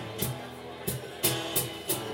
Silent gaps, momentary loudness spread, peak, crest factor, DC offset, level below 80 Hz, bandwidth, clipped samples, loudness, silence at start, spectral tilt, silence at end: none; 10 LU; -10 dBFS; 22 dB; under 0.1%; -56 dBFS; over 20 kHz; under 0.1%; -31 LUFS; 0 s; -3 dB/octave; 0 s